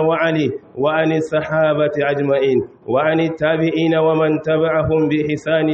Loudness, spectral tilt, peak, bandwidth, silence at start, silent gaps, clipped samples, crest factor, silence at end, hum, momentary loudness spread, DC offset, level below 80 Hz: -17 LUFS; -7.5 dB/octave; -4 dBFS; 8 kHz; 0 s; none; under 0.1%; 12 dB; 0 s; none; 4 LU; under 0.1%; -48 dBFS